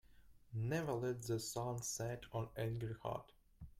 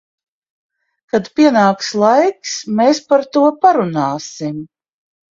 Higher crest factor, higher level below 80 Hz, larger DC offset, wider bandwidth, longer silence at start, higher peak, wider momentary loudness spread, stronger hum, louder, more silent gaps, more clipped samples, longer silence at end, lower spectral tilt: about the same, 16 dB vs 16 dB; about the same, -66 dBFS vs -62 dBFS; neither; first, 16 kHz vs 7.6 kHz; second, 0.05 s vs 1.15 s; second, -28 dBFS vs 0 dBFS; second, 7 LU vs 12 LU; neither; second, -43 LUFS vs -14 LUFS; neither; neither; second, 0.1 s vs 0.65 s; about the same, -5 dB/octave vs -5 dB/octave